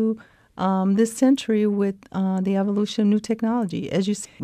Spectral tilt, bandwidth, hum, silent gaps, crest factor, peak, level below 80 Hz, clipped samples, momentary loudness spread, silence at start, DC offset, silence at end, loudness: -6.5 dB/octave; 13 kHz; none; none; 14 dB; -6 dBFS; -62 dBFS; under 0.1%; 7 LU; 0 s; under 0.1%; 0 s; -22 LUFS